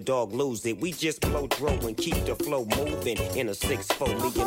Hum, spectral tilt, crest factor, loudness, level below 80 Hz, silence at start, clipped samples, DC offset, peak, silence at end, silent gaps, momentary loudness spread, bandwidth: none; -4.5 dB/octave; 18 dB; -28 LUFS; -40 dBFS; 0 s; under 0.1%; under 0.1%; -10 dBFS; 0 s; none; 2 LU; 16.5 kHz